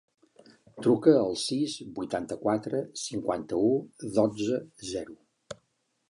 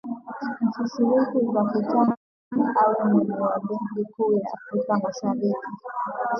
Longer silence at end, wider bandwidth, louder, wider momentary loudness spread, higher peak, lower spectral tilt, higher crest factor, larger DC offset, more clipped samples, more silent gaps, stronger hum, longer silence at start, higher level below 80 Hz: first, 0.55 s vs 0 s; first, 11.5 kHz vs 6.4 kHz; second, -28 LUFS vs -24 LUFS; first, 15 LU vs 10 LU; about the same, -8 dBFS vs -8 dBFS; second, -5.5 dB/octave vs -8 dB/octave; first, 22 dB vs 16 dB; neither; neither; second, none vs 2.17-2.51 s; neither; first, 0.75 s vs 0.05 s; about the same, -66 dBFS vs -70 dBFS